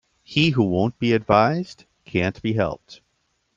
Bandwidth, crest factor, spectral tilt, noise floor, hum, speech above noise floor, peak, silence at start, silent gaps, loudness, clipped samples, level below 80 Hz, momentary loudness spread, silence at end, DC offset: 7.8 kHz; 20 dB; -7 dB/octave; -70 dBFS; none; 49 dB; -2 dBFS; 0.3 s; none; -21 LUFS; under 0.1%; -52 dBFS; 10 LU; 0.65 s; under 0.1%